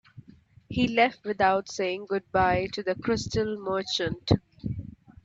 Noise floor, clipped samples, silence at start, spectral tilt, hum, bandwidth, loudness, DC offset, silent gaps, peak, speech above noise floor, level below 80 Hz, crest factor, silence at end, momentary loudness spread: -55 dBFS; under 0.1%; 0.15 s; -5.5 dB/octave; none; 8 kHz; -27 LUFS; under 0.1%; none; -6 dBFS; 29 dB; -50 dBFS; 22 dB; 0.15 s; 11 LU